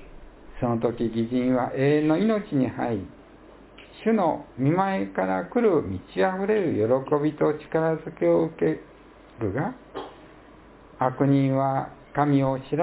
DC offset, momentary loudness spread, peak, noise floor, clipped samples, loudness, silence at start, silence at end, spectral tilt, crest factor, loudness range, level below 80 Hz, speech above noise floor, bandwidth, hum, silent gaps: under 0.1%; 9 LU; -6 dBFS; -49 dBFS; under 0.1%; -25 LUFS; 0 s; 0 s; -12 dB/octave; 18 dB; 4 LU; -52 dBFS; 26 dB; 4 kHz; none; none